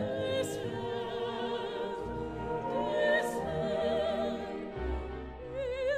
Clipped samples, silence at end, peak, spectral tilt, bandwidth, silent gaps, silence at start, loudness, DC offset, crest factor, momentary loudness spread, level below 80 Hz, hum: under 0.1%; 0 s; -16 dBFS; -5.5 dB/octave; 15.5 kHz; none; 0 s; -34 LUFS; under 0.1%; 18 dB; 8 LU; -48 dBFS; none